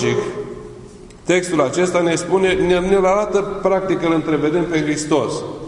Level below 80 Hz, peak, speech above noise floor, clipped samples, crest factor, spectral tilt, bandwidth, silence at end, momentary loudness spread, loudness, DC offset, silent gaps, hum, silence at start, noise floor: -42 dBFS; -2 dBFS; 21 dB; under 0.1%; 16 dB; -5 dB/octave; 11 kHz; 0 s; 11 LU; -17 LUFS; under 0.1%; none; none; 0 s; -38 dBFS